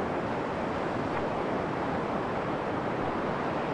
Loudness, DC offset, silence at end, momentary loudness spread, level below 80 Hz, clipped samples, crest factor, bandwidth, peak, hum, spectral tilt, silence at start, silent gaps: -31 LUFS; under 0.1%; 0 s; 1 LU; -54 dBFS; under 0.1%; 14 dB; 11 kHz; -16 dBFS; none; -7 dB/octave; 0 s; none